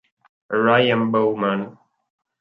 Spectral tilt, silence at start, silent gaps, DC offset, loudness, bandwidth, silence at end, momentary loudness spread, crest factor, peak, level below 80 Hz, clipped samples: -8.5 dB/octave; 0.5 s; none; under 0.1%; -19 LUFS; 5.4 kHz; 0.7 s; 11 LU; 18 dB; -2 dBFS; -66 dBFS; under 0.1%